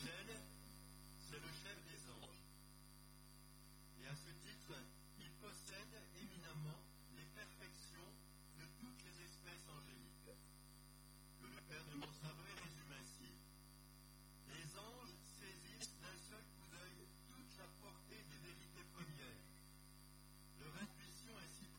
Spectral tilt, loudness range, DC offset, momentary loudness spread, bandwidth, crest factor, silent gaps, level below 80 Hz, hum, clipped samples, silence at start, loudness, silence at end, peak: -3.5 dB/octave; 3 LU; under 0.1%; 10 LU; 17.5 kHz; 22 dB; none; -68 dBFS; 50 Hz at -65 dBFS; under 0.1%; 0 s; -58 LUFS; 0 s; -38 dBFS